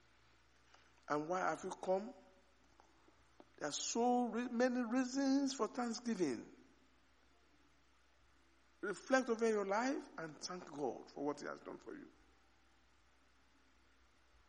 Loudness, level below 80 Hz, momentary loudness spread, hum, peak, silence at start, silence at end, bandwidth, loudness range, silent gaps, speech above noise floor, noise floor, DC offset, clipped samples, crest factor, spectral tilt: -40 LUFS; -78 dBFS; 13 LU; none; -20 dBFS; 1.1 s; 2.4 s; 10.5 kHz; 10 LU; none; 34 dB; -73 dBFS; under 0.1%; under 0.1%; 22 dB; -4 dB/octave